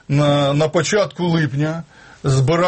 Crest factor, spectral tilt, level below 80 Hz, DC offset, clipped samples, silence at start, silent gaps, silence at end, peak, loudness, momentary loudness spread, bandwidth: 12 dB; -6 dB/octave; -48 dBFS; under 0.1%; under 0.1%; 0.1 s; none; 0 s; -6 dBFS; -18 LUFS; 8 LU; 8.8 kHz